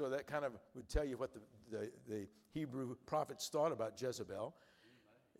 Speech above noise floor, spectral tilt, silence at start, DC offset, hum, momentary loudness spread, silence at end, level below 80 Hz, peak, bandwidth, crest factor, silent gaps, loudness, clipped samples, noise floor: 26 dB; -5 dB/octave; 0 s; under 0.1%; none; 10 LU; 0.5 s; -56 dBFS; -24 dBFS; 16 kHz; 20 dB; none; -44 LUFS; under 0.1%; -70 dBFS